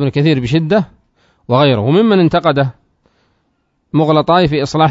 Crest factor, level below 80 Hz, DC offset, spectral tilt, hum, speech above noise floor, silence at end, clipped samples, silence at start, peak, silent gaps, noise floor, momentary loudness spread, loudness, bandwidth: 14 dB; -44 dBFS; under 0.1%; -7.5 dB/octave; none; 52 dB; 0 s; under 0.1%; 0 s; 0 dBFS; none; -63 dBFS; 6 LU; -13 LUFS; 7.8 kHz